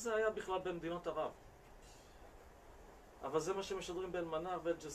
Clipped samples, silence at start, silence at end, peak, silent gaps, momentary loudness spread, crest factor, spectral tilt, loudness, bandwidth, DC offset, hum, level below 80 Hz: under 0.1%; 0 s; 0 s; -24 dBFS; none; 22 LU; 20 dB; -4.5 dB/octave; -41 LUFS; 14.5 kHz; under 0.1%; none; -64 dBFS